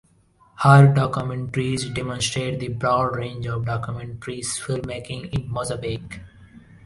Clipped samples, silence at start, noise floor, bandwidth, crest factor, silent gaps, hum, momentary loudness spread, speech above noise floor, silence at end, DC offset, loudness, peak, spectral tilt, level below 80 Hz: under 0.1%; 0.6 s; -58 dBFS; 11.5 kHz; 22 dB; none; none; 17 LU; 36 dB; 0.25 s; under 0.1%; -22 LUFS; 0 dBFS; -5.5 dB/octave; -48 dBFS